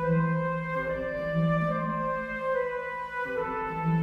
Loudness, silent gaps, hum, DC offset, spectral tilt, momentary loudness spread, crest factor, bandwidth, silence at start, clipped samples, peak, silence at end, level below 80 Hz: -29 LUFS; none; none; under 0.1%; -9 dB/octave; 6 LU; 14 dB; 5.2 kHz; 0 s; under 0.1%; -14 dBFS; 0 s; -52 dBFS